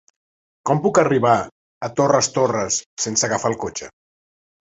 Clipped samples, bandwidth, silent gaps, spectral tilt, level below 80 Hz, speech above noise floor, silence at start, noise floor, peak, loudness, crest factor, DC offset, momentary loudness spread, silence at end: under 0.1%; 8.2 kHz; 1.52-1.81 s, 2.86-2.97 s; -4 dB/octave; -56 dBFS; over 71 dB; 0.65 s; under -90 dBFS; -2 dBFS; -19 LUFS; 20 dB; under 0.1%; 13 LU; 0.85 s